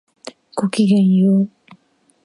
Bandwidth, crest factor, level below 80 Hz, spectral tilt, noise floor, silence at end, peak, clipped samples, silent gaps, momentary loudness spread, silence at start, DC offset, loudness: 11 kHz; 14 dB; -68 dBFS; -7.5 dB/octave; -57 dBFS; 0.75 s; -4 dBFS; under 0.1%; none; 21 LU; 0.25 s; under 0.1%; -16 LUFS